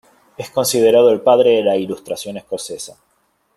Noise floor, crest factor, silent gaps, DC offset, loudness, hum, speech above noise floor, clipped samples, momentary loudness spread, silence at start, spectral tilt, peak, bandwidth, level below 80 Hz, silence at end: -63 dBFS; 16 dB; none; under 0.1%; -15 LUFS; none; 48 dB; under 0.1%; 17 LU; 0.4 s; -4 dB/octave; -2 dBFS; 13.5 kHz; -62 dBFS; 0.7 s